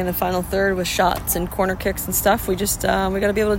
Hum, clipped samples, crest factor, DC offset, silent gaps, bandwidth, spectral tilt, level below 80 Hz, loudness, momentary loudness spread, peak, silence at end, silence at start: none; under 0.1%; 16 dB; under 0.1%; none; 16.5 kHz; -4 dB/octave; -34 dBFS; -20 LUFS; 3 LU; -4 dBFS; 0 s; 0 s